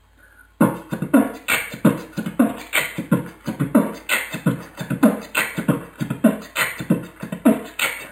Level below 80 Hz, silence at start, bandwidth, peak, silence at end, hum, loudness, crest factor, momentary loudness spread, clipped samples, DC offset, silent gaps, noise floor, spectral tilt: -54 dBFS; 0.6 s; 16.5 kHz; -2 dBFS; 0 s; none; -21 LUFS; 20 dB; 9 LU; under 0.1%; under 0.1%; none; -51 dBFS; -5 dB/octave